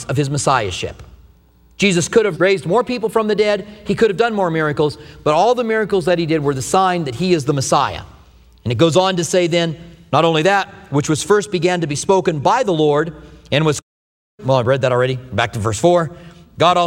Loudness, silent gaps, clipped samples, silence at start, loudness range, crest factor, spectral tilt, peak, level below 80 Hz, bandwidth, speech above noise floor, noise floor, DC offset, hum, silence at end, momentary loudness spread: -17 LUFS; 13.83-14.38 s; under 0.1%; 0 s; 2 LU; 16 dB; -5 dB/octave; 0 dBFS; -46 dBFS; 16 kHz; 34 dB; -50 dBFS; under 0.1%; none; 0 s; 8 LU